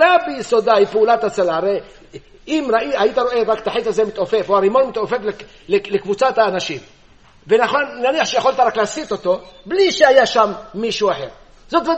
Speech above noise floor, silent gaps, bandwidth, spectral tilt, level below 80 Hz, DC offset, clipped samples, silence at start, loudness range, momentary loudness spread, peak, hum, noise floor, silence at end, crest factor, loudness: 32 dB; none; 8.4 kHz; -4 dB/octave; -50 dBFS; 0.2%; under 0.1%; 0 s; 3 LU; 9 LU; 0 dBFS; none; -49 dBFS; 0 s; 16 dB; -17 LUFS